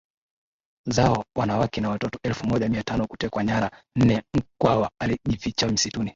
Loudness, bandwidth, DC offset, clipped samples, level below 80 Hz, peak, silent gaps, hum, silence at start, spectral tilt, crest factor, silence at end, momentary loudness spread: -24 LUFS; 7.8 kHz; under 0.1%; under 0.1%; -44 dBFS; -4 dBFS; none; none; 0.85 s; -5.5 dB/octave; 20 dB; 0.05 s; 7 LU